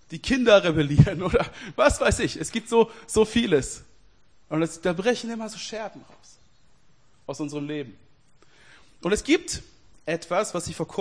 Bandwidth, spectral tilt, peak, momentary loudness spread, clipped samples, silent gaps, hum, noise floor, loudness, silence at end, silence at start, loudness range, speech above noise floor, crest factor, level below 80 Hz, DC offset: 10.5 kHz; -5 dB/octave; -4 dBFS; 15 LU; under 0.1%; none; none; -61 dBFS; -24 LUFS; 0 s; 0.1 s; 14 LU; 38 dB; 22 dB; -44 dBFS; 0.2%